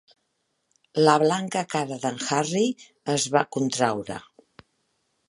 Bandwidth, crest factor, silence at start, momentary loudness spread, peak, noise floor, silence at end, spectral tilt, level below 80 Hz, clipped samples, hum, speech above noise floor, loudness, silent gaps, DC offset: 11.5 kHz; 24 dB; 0.95 s; 13 LU; -2 dBFS; -75 dBFS; 1.05 s; -4 dB/octave; -70 dBFS; under 0.1%; none; 51 dB; -24 LUFS; none; under 0.1%